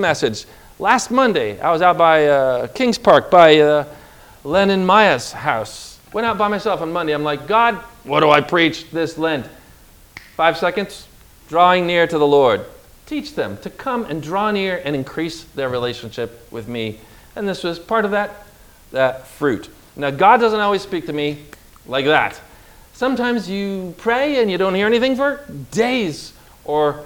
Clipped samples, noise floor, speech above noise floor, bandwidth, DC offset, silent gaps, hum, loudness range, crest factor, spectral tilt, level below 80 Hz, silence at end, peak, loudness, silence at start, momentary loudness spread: under 0.1%; -46 dBFS; 29 dB; over 20 kHz; under 0.1%; none; none; 9 LU; 18 dB; -5 dB/octave; -50 dBFS; 0 s; 0 dBFS; -17 LUFS; 0 s; 15 LU